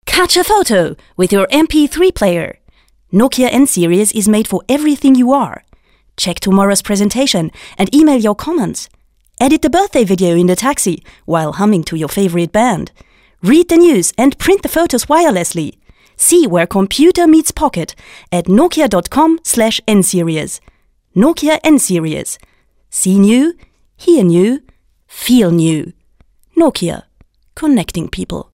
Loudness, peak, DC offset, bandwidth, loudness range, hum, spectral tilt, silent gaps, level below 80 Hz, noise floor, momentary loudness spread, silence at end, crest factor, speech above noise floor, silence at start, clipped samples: -12 LUFS; 0 dBFS; under 0.1%; 16.5 kHz; 3 LU; none; -4.5 dB/octave; none; -38 dBFS; -50 dBFS; 12 LU; 0.1 s; 12 dB; 39 dB; 0.05 s; under 0.1%